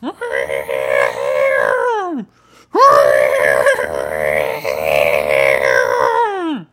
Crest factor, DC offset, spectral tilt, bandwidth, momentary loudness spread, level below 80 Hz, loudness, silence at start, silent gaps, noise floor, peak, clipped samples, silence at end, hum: 14 dB; under 0.1%; -3.5 dB/octave; 16 kHz; 10 LU; -48 dBFS; -14 LUFS; 0 s; none; -47 dBFS; 0 dBFS; under 0.1%; 0.1 s; none